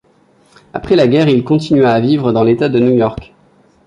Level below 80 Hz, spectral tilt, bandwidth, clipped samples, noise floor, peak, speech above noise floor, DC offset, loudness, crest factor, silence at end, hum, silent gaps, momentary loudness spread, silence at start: -44 dBFS; -8 dB/octave; 10.5 kHz; under 0.1%; -51 dBFS; -2 dBFS; 40 dB; under 0.1%; -12 LUFS; 12 dB; 0.6 s; none; none; 10 LU; 0.75 s